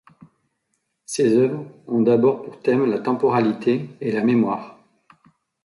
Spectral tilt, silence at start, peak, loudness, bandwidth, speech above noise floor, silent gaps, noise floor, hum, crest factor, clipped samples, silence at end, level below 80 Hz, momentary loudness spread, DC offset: -6.5 dB/octave; 1.1 s; -6 dBFS; -20 LUFS; 11.5 kHz; 54 dB; none; -73 dBFS; none; 16 dB; under 0.1%; 0.95 s; -66 dBFS; 8 LU; under 0.1%